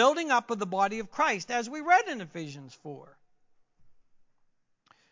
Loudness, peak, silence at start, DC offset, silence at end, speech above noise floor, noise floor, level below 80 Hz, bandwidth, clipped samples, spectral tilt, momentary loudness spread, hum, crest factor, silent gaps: -28 LUFS; -10 dBFS; 0 s; under 0.1%; 1.2 s; 41 dB; -69 dBFS; -74 dBFS; 7.6 kHz; under 0.1%; -3.5 dB/octave; 20 LU; none; 20 dB; none